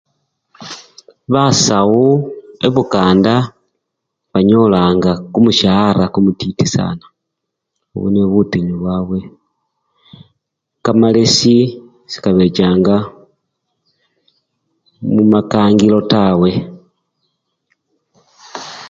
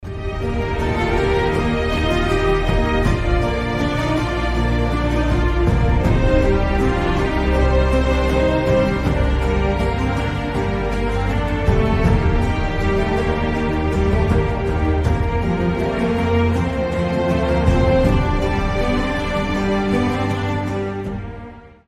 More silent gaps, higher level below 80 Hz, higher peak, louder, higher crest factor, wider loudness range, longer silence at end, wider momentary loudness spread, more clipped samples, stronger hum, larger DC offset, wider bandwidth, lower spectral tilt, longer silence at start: neither; second, -44 dBFS vs -22 dBFS; first, 0 dBFS vs -4 dBFS; first, -13 LUFS vs -19 LUFS; about the same, 14 dB vs 14 dB; first, 5 LU vs 2 LU; second, 0 s vs 0.2 s; first, 17 LU vs 5 LU; neither; neither; neither; second, 9 kHz vs 12 kHz; second, -5.5 dB/octave vs -7 dB/octave; first, 0.6 s vs 0 s